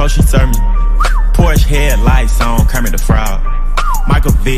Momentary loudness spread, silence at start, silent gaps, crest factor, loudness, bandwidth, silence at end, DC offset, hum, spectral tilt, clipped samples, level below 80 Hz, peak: 5 LU; 0 s; none; 8 dB; -13 LUFS; 15.5 kHz; 0 s; under 0.1%; none; -5.5 dB/octave; 0.3%; -10 dBFS; 0 dBFS